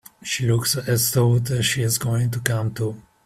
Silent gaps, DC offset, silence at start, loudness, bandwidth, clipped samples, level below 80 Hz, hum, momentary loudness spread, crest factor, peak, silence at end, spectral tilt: none; under 0.1%; 0.2 s; -21 LUFS; 16 kHz; under 0.1%; -52 dBFS; none; 8 LU; 20 dB; 0 dBFS; 0.25 s; -4.5 dB/octave